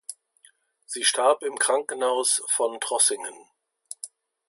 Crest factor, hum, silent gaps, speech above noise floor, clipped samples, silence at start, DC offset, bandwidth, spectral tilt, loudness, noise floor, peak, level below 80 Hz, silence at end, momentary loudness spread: 20 dB; none; none; 36 dB; under 0.1%; 0.1 s; under 0.1%; 12 kHz; 1.5 dB/octave; -23 LUFS; -60 dBFS; -8 dBFS; -88 dBFS; 0.4 s; 17 LU